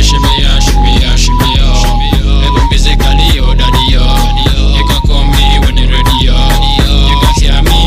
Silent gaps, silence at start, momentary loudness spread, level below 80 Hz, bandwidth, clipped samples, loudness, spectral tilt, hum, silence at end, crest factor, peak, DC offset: none; 0 s; 2 LU; -8 dBFS; 15.5 kHz; 0.1%; -9 LUFS; -4.5 dB/octave; none; 0 s; 6 dB; 0 dBFS; under 0.1%